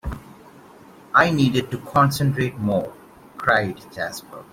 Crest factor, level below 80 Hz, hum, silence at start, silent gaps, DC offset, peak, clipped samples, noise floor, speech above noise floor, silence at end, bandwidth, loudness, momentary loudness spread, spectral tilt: 20 dB; -44 dBFS; none; 0.05 s; none; under 0.1%; -2 dBFS; under 0.1%; -46 dBFS; 26 dB; 0.1 s; 16.5 kHz; -21 LUFS; 15 LU; -6 dB/octave